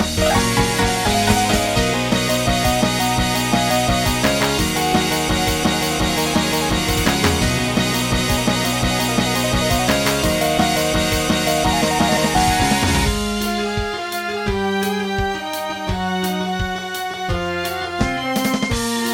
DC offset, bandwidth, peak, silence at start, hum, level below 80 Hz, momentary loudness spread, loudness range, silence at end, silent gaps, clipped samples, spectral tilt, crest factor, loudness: under 0.1%; 17 kHz; -2 dBFS; 0 s; none; -30 dBFS; 6 LU; 5 LU; 0 s; none; under 0.1%; -4 dB/octave; 16 dB; -18 LUFS